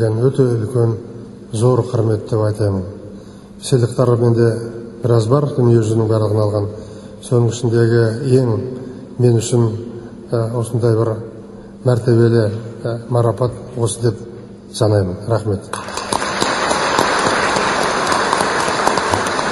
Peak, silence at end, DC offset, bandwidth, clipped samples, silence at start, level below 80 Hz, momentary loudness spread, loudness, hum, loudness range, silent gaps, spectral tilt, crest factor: 0 dBFS; 0 s; under 0.1%; 12 kHz; under 0.1%; 0 s; -46 dBFS; 16 LU; -16 LUFS; none; 3 LU; none; -6 dB/octave; 16 dB